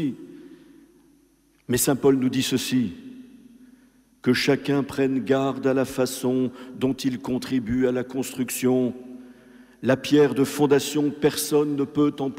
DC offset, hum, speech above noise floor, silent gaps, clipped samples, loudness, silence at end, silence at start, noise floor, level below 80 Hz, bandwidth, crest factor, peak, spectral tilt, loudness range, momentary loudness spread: under 0.1%; none; 38 dB; none; under 0.1%; -23 LUFS; 0 s; 0 s; -61 dBFS; -58 dBFS; 16 kHz; 16 dB; -8 dBFS; -5 dB/octave; 3 LU; 10 LU